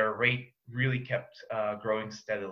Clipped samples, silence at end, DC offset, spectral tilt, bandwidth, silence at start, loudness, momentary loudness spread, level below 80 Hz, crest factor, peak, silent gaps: under 0.1%; 0 s; under 0.1%; -6 dB/octave; 7 kHz; 0 s; -32 LUFS; 8 LU; -68 dBFS; 20 dB; -12 dBFS; none